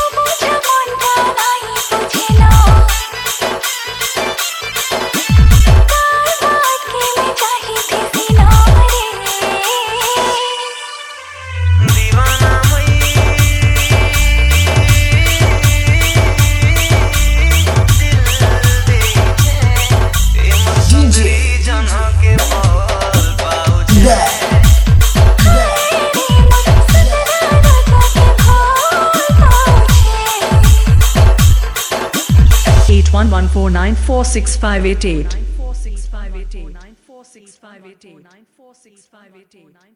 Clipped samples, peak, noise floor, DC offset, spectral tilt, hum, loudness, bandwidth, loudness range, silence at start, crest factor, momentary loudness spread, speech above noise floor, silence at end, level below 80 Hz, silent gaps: 0.6%; 0 dBFS; -44 dBFS; under 0.1%; -4.5 dB/octave; none; -11 LUFS; 18 kHz; 5 LU; 0 s; 10 dB; 8 LU; 26 dB; 3.15 s; -14 dBFS; none